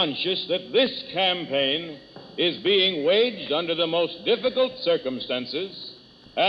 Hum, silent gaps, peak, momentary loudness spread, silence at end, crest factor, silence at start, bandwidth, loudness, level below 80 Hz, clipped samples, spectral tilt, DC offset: none; none; -10 dBFS; 14 LU; 0 s; 16 dB; 0 s; 6 kHz; -23 LUFS; -66 dBFS; under 0.1%; -6 dB/octave; under 0.1%